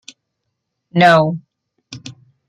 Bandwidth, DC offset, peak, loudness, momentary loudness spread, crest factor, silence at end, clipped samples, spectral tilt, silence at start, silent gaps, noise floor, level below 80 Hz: 11 kHz; under 0.1%; 0 dBFS; -13 LUFS; 23 LU; 18 dB; 0.35 s; under 0.1%; -6 dB/octave; 0.95 s; none; -75 dBFS; -62 dBFS